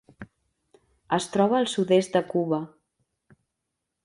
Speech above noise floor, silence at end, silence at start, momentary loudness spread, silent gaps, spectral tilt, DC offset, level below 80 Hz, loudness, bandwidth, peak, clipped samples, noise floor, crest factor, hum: 59 dB; 1.4 s; 0.2 s; 7 LU; none; -5.5 dB/octave; under 0.1%; -66 dBFS; -24 LUFS; 11.5 kHz; -8 dBFS; under 0.1%; -82 dBFS; 18 dB; none